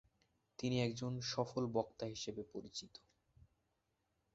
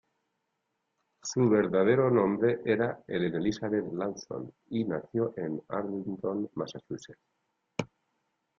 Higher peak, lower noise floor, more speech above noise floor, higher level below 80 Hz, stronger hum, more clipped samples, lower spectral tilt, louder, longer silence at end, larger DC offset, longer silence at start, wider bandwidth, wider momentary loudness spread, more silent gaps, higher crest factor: second, -22 dBFS vs -12 dBFS; about the same, -84 dBFS vs -81 dBFS; second, 43 dB vs 52 dB; about the same, -72 dBFS vs -68 dBFS; neither; neither; about the same, -5.5 dB/octave vs -6.5 dB/octave; second, -42 LUFS vs -30 LUFS; first, 1.35 s vs 0.75 s; neither; second, 0.6 s vs 1.25 s; about the same, 8 kHz vs 7.6 kHz; about the same, 14 LU vs 15 LU; neither; about the same, 22 dB vs 18 dB